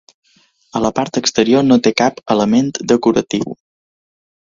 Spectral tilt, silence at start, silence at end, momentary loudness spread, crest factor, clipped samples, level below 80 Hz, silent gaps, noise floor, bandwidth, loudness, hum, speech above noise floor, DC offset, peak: -4.5 dB/octave; 0.75 s; 0.95 s; 10 LU; 16 dB; under 0.1%; -52 dBFS; none; -55 dBFS; 7.6 kHz; -15 LUFS; none; 41 dB; under 0.1%; 0 dBFS